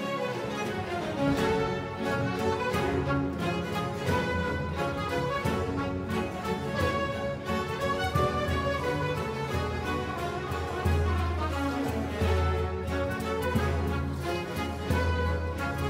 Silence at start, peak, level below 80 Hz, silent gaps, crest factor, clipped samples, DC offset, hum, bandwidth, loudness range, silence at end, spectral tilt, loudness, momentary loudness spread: 0 s; -14 dBFS; -40 dBFS; none; 16 dB; under 0.1%; under 0.1%; none; 16 kHz; 1 LU; 0 s; -6 dB/octave; -30 LUFS; 5 LU